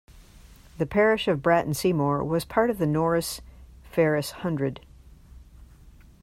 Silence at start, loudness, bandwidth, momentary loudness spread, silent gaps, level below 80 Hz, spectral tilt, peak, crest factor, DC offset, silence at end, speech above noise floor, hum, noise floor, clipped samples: 0.1 s; -25 LUFS; 16 kHz; 10 LU; none; -50 dBFS; -6 dB/octave; -8 dBFS; 20 dB; under 0.1%; 0.35 s; 27 dB; none; -51 dBFS; under 0.1%